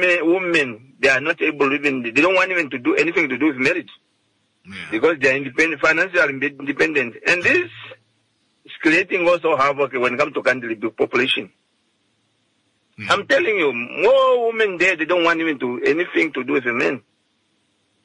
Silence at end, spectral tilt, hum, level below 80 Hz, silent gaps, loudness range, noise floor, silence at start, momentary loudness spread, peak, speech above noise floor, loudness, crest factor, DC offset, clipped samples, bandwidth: 1.05 s; -4 dB/octave; none; -62 dBFS; none; 3 LU; -66 dBFS; 0 s; 7 LU; -4 dBFS; 47 dB; -18 LUFS; 16 dB; under 0.1%; under 0.1%; 11 kHz